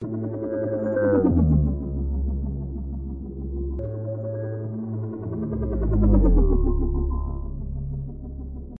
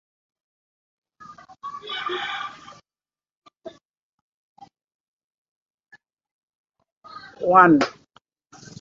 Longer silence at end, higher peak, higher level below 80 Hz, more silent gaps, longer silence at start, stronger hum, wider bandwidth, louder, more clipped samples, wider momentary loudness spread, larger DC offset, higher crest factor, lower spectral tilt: second, 0 s vs 0.9 s; second, -6 dBFS vs -2 dBFS; first, -26 dBFS vs -68 dBFS; second, none vs 3.37-3.42 s, 3.85-3.90 s, 3.97-4.56 s, 4.84-4.88 s, 4.94-5.45 s, 5.51-5.78 s, 6.31-6.64 s, 6.92-7.01 s; second, 0 s vs 1.3 s; neither; second, 2.1 kHz vs 7.6 kHz; second, -25 LUFS vs -20 LUFS; neither; second, 14 LU vs 30 LU; neither; second, 18 dB vs 26 dB; first, -14 dB/octave vs -5.5 dB/octave